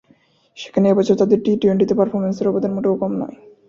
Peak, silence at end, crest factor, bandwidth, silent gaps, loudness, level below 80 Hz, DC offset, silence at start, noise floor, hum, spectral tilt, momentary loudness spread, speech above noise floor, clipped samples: -2 dBFS; 0.4 s; 16 dB; 7.4 kHz; none; -18 LUFS; -58 dBFS; under 0.1%; 0.55 s; -56 dBFS; none; -8 dB/octave; 9 LU; 39 dB; under 0.1%